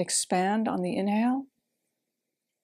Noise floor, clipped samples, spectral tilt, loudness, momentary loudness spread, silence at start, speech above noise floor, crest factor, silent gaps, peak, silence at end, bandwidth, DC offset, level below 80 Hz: -85 dBFS; under 0.1%; -4 dB/octave; -27 LUFS; 3 LU; 0 s; 58 dB; 16 dB; none; -14 dBFS; 1.2 s; 15.5 kHz; under 0.1%; -78 dBFS